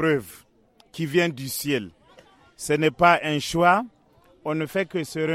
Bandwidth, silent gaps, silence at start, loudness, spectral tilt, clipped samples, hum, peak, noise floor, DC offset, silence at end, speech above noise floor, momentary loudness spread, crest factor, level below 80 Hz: 16.5 kHz; none; 0 s; -23 LUFS; -5 dB/octave; under 0.1%; none; -2 dBFS; -57 dBFS; under 0.1%; 0 s; 34 dB; 17 LU; 22 dB; -56 dBFS